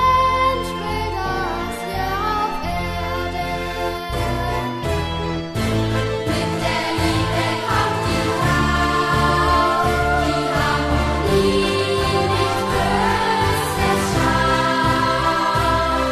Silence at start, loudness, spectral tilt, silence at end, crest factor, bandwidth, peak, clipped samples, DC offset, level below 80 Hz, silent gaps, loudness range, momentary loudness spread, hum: 0 s; -19 LUFS; -5 dB/octave; 0 s; 14 dB; 14 kHz; -4 dBFS; under 0.1%; under 0.1%; -30 dBFS; none; 5 LU; 7 LU; none